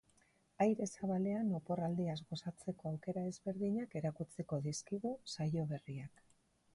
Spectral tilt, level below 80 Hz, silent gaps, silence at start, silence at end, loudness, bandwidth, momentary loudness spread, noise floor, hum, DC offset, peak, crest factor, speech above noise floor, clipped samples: -6.5 dB/octave; -72 dBFS; none; 0.6 s; 0.65 s; -40 LUFS; 11.5 kHz; 9 LU; -73 dBFS; none; under 0.1%; -22 dBFS; 18 dB; 34 dB; under 0.1%